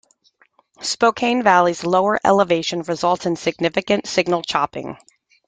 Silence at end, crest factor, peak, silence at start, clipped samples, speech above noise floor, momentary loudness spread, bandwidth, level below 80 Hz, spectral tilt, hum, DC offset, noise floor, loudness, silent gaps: 0.55 s; 18 dB; -2 dBFS; 0.8 s; under 0.1%; 40 dB; 9 LU; 9.6 kHz; -60 dBFS; -4 dB/octave; none; under 0.1%; -59 dBFS; -18 LUFS; none